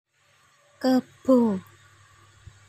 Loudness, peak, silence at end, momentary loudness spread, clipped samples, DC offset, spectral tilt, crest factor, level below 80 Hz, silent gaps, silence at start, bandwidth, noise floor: -24 LUFS; -8 dBFS; 1.1 s; 8 LU; under 0.1%; under 0.1%; -7 dB/octave; 18 dB; -66 dBFS; none; 0.8 s; 13.5 kHz; -62 dBFS